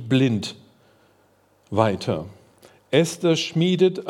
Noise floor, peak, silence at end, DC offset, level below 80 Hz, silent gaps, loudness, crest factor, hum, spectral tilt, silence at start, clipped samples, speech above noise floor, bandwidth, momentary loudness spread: -60 dBFS; -4 dBFS; 0 s; under 0.1%; -66 dBFS; none; -22 LUFS; 18 dB; none; -6 dB/octave; 0 s; under 0.1%; 39 dB; 14 kHz; 10 LU